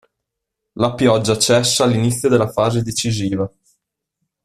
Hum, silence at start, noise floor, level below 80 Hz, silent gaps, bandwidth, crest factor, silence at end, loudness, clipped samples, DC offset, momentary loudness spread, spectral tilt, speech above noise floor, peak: none; 0.75 s; -80 dBFS; -50 dBFS; none; 14.5 kHz; 16 dB; 0.95 s; -17 LUFS; under 0.1%; under 0.1%; 8 LU; -4.5 dB/octave; 63 dB; -2 dBFS